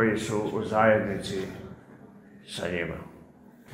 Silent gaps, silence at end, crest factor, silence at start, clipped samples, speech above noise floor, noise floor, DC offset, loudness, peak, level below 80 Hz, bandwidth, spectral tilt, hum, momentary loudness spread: none; 0 s; 22 dB; 0 s; under 0.1%; 25 dB; -52 dBFS; under 0.1%; -27 LUFS; -8 dBFS; -56 dBFS; 15.5 kHz; -5.5 dB/octave; none; 22 LU